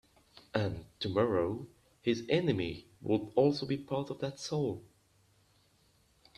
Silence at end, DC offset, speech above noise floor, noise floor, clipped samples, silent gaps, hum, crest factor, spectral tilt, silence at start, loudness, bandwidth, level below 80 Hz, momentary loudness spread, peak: 1.55 s; under 0.1%; 36 dB; -69 dBFS; under 0.1%; none; none; 20 dB; -6.5 dB/octave; 0.35 s; -34 LUFS; 13 kHz; -64 dBFS; 10 LU; -14 dBFS